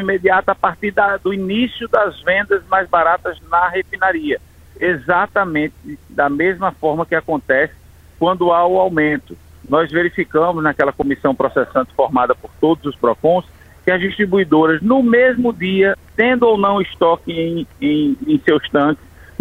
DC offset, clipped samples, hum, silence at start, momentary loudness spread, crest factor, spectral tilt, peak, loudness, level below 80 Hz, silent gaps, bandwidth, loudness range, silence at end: under 0.1%; under 0.1%; none; 0 s; 6 LU; 16 dB; -7.5 dB/octave; 0 dBFS; -16 LUFS; -46 dBFS; none; 15.5 kHz; 4 LU; 0.45 s